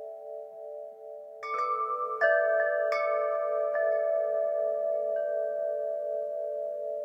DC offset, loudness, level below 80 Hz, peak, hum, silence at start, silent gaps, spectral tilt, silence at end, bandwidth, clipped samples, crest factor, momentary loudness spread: under 0.1%; -29 LUFS; under -90 dBFS; -12 dBFS; none; 0 s; none; -2.5 dB/octave; 0 s; 7.4 kHz; under 0.1%; 18 dB; 16 LU